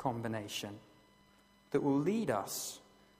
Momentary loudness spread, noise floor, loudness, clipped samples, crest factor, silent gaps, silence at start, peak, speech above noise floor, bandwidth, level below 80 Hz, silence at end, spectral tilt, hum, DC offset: 15 LU; -66 dBFS; -36 LUFS; under 0.1%; 20 dB; none; 0 s; -18 dBFS; 31 dB; 15.5 kHz; -72 dBFS; 0.4 s; -5 dB/octave; none; under 0.1%